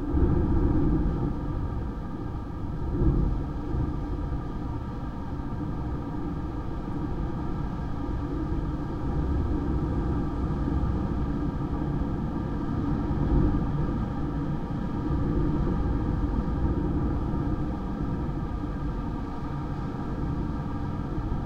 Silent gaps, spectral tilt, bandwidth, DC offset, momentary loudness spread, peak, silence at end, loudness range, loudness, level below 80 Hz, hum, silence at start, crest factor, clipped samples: none; -10 dB/octave; 6.8 kHz; under 0.1%; 8 LU; -12 dBFS; 0 s; 5 LU; -30 LUFS; -32 dBFS; none; 0 s; 16 dB; under 0.1%